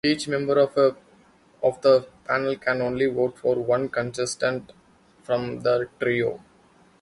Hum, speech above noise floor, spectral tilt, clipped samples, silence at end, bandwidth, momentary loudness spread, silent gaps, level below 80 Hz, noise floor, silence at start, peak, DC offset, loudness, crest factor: none; 34 dB; -5 dB/octave; under 0.1%; 0.65 s; 11.5 kHz; 7 LU; none; -60 dBFS; -57 dBFS; 0.05 s; -6 dBFS; under 0.1%; -24 LUFS; 18 dB